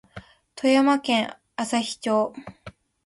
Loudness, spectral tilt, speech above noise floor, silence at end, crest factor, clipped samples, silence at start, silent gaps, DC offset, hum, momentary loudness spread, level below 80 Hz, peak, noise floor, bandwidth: -23 LUFS; -4 dB/octave; 24 dB; 0.35 s; 18 dB; under 0.1%; 0.15 s; none; under 0.1%; none; 12 LU; -62 dBFS; -8 dBFS; -46 dBFS; 11.5 kHz